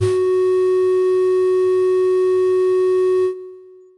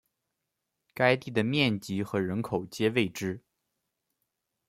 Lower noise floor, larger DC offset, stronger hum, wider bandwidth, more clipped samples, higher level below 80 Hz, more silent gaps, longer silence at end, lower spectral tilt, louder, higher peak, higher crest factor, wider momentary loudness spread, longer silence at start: second, -41 dBFS vs -84 dBFS; neither; neither; second, 10.5 kHz vs 16.5 kHz; neither; about the same, -66 dBFS vs -68 dBFS; neither; second, 0.4 s vs 1.3 s; first, -7.5 dB/octave vs -5.5 dB/octave; first, -16 LUFS vs -29 LUFS; about the same, -8 dBFS vs -8 dBFS; second, 10 dB vs 22 dB; second, 1 LU vs 10 LU; second, 0 s vs 0.95 s